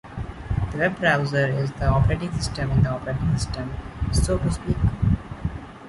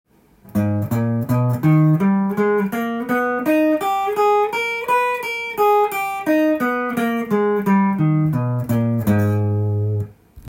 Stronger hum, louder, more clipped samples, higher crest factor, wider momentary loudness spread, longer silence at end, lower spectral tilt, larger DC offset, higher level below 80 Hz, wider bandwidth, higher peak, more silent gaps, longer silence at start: neither; second, -24 LUFS vs -19 LUFS; neither; about the same, 16 dB vs 12 dB; first, 11 LU vs 6 LU; about the same, 0 s vs 0 s; second, -6 dB/octave vs -7.5 dB/octave; neither; first, -32 dBFS vs -54 dBFS; second, 11.5 kHz vs 17 kHz; about the same, -6 dBFS vs -6 dBFS; neither; second, 0.05 s vs 0.45 s